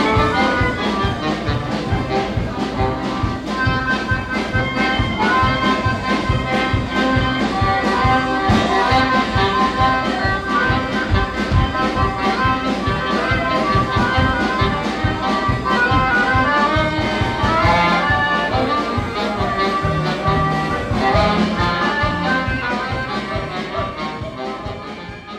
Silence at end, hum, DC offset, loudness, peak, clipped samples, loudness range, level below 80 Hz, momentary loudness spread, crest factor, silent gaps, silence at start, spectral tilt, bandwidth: 0 s; none; under 0.1%; -18 LUFS; -4 dBFS; under 0.1%; 4 LU; -30 dBFS; 7 LU; 14 dB; none; 0 s; -6 dB/octave; 13 kHz